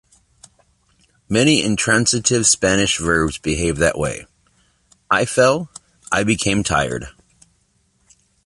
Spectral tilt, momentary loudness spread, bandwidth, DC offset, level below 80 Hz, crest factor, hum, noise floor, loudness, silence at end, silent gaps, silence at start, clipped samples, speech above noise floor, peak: -3.5 dB/octave; 10 LU; 11.5 kHz; under 0.1%; -40 dBFS; 18 dB; none; -62 dBFS; -17 LUFS; 1.35 s; none; 1.3 s; under 0.1%; 45 dB; -2 dBFS